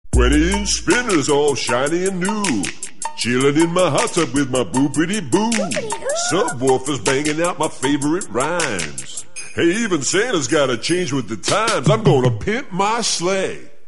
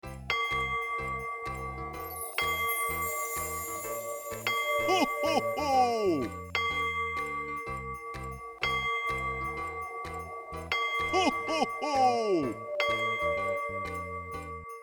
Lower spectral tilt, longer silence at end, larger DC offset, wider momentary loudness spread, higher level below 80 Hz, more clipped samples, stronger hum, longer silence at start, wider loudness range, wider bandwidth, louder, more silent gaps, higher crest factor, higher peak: about the same, -4 dB/octave vs -3.5 dB/octave; first, 0.2 s vs 0 s; first, 3% vs under 0.1%; second, 7 LU vs 11 LU; first, -32 dBFS vs -52 dBFS; neither; neither; about the same, 0.15 s vs 0.05 s; about the same, 2 LU vs 4 LU; second, 12 kHz vs over 20 kHz; first, -18 LUFS vs -31 LUFS; neither; about the same, 16 dB vs 18 dB; first, -2 dBFS vs -14 dBFS